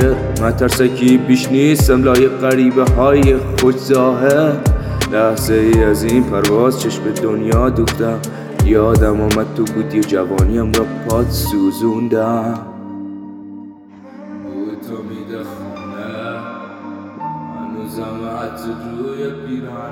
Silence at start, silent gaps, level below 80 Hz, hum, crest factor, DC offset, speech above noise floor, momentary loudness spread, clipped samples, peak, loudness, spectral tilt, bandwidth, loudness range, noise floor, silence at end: 0 s; none; -26 dBFS; none; 14 dB; under 0.1%; 24 dB; 17 LU; under 0.1%; 0 dBFS; -15 LUFS; -6 dB/octave; 19 kHz; 15 LU; -37 dBFS; 0 s